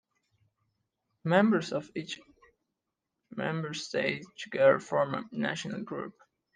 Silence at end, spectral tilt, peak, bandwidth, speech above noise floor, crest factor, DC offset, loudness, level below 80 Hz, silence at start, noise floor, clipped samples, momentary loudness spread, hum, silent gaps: 0.45 s; -5.5 dB/octave; -10 dBFS; 9.6 kHz; 56 dB; 22 dB; under 0.1%; -30 LUFS; -76 dBFS; 1.25 s; -86 dBFS; under 0.1%; 15 LU; none; none